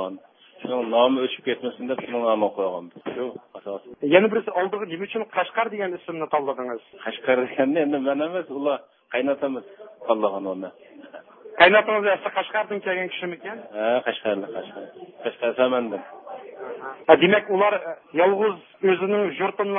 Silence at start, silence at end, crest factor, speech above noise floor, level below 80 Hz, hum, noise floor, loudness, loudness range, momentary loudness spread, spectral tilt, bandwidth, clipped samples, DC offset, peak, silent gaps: 0 s; 0 s; 24 dB; 23 dB; -70 dBFS; none; -46 dBFS; -23 LUFS; 5 LU; 17 LU; -9 dB/octave; 4.4 kHz; under 0.1%; under 0.1%; 0 dBFS; none